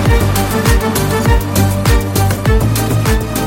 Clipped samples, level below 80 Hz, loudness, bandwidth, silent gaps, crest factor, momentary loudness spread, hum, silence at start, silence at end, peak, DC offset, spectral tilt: under 0.1%; -18 dBFS; -13 LUFS; 17 kHz; none; 12 dB; 2 LU; none; 0 s; 0 s; 0 dBFS; under 0.1%; -5.5 dB/octave